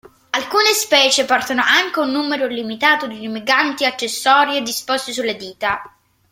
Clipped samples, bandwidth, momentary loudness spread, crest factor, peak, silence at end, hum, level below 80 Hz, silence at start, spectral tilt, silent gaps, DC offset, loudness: under 0.1%; 16.5 kHz; 10 LU; 18 dB; 0 dBFS; 0.45 s; none; -62 dBFS; 0.35 s; -1 dB/octave; none; under 0.1%; -16 LUFS